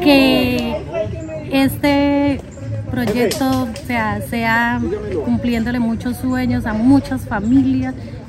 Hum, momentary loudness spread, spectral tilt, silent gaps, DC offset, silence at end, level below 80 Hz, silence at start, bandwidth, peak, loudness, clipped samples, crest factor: none; 9 LU; -6 dB/octave; none; under 0.1%; 0 s; -36 dBFS; 0 s; 16 kHz; 0 dBFS; -17 LUFS; under 0.1%; 16 dB